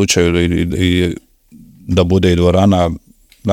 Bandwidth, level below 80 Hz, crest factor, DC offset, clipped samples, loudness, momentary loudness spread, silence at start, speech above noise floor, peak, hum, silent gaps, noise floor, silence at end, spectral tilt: 16 kHz; -36 dBFS; 14 dB; under 0.1%; under 0.1%; -14 LUFS; 15 LU; 0 s; 30 dB; 0 dBFS; none; none; -43 dBFS; 0 s; -5.5 dB/octave